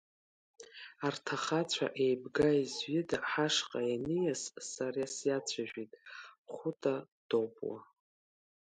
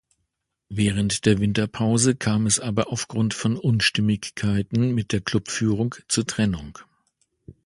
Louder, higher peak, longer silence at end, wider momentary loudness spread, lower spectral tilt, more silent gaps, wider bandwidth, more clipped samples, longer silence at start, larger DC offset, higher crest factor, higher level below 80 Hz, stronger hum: second, -35 LUFS vs -23 LUFS; second, -16 dBFS vs -4 dBFS; first, 0.85 s vs 0.15 s; first, 17 LU vs 5 LU; about the same, -4 dB/octave vs -4.5 dB/octave; first, 6.38-6.44 s, 7.12-7.29 s vs none; about the same, 11 kHz vs 11.5 kHz; neither; about the same, 0.6 s vs 0.7 s; neither; about the same, 20 dB vs 18 dB; second, -70 dBFS vs -48 dBFS; neither